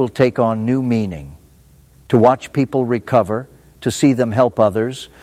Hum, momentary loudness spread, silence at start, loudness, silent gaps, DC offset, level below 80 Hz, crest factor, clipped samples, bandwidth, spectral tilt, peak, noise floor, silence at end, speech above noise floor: none; 10 LU; 0 s; -17 LUFS; none; under 0.1%; -50 dBFS; 16 dB; under 0.1%; 15 kHz; -7 dB/octave; -2 dBFS; -49 dBFS; 0.15 s; 32 dB